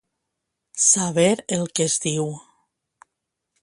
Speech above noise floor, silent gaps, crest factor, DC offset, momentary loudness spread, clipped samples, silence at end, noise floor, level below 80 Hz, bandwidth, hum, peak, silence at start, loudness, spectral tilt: 60 dB; none; 20 dB; under 0.1%; 14 LU; under 0.1%; 1.25 s; -80 dBFS; -64 dBFS; 11.5 kHz; none; -4 dBFS; 0.75 s; -20 LUFS; -3.5 dB/octave